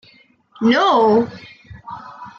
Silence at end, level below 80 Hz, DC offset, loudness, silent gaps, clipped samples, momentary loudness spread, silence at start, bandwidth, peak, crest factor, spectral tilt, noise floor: 0.1 s; -58 dBFS; under 0.1%; -16 LUFS; none; under 0.1%; 21 LU; 0.6 s; 7.2 kHz; -4 dBFS; 14 dB; -5.5 dB/octave; -52 dBFS